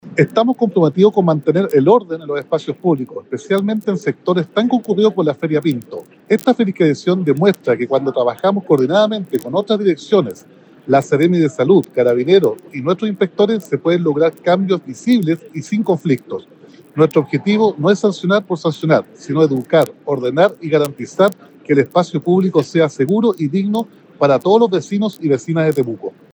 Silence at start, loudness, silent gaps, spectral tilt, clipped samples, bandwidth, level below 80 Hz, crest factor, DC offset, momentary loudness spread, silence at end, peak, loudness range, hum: 0.05 s; -16 LUFS; none; -7 dB/octave; under 0.1%; over 20 kHz; -70 dBFS; 16 dB; under 0.1%; 8 LU; 0.25 s; 0 dBFS; 2 LU; none